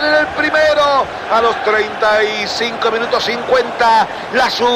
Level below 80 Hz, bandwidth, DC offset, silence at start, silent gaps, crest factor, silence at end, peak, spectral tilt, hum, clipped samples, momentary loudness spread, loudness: -48 dBFS; 15.5 kHz; under 0.1%; 0 s; none; 12 dB; 0 s; 0 dBFS; -3 dB/octave; none; under 0.1%; 4 LU; -14 LUFS